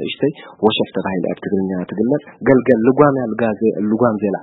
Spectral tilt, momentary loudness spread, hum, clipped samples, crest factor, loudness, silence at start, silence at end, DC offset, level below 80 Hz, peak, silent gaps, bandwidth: -10 dB/octave; 8 LU; none; under 0.1%; 16 dB; -17 LUFS; 0 s; 0 s; under 0.1%; -54 dBFS; 0 dBFS; none; 4.1 kHz